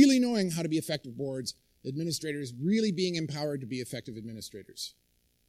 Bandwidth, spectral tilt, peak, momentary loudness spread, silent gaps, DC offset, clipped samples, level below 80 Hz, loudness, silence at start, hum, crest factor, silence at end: 15.5 kHz; -5 dB/octave; -8 dBFS; 14 LU; none; under 0.1%; under 0.1%; -70 dBFS; -32 LUFS; 0 s; none; 22 dB; 0.6 s